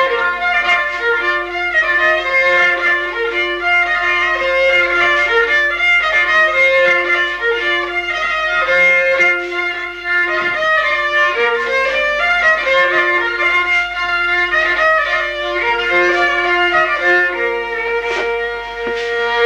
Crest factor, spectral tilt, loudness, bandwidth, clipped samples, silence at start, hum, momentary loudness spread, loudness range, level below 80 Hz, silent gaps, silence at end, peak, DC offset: 12 dB; -2.5 dB/octave; -13 LUFS; 15 kHz; under 0.1%; 0 s; none; 7 LU; 2 LU; -44 dBFS; none; 0 s; -4 dBFS; under 0.1%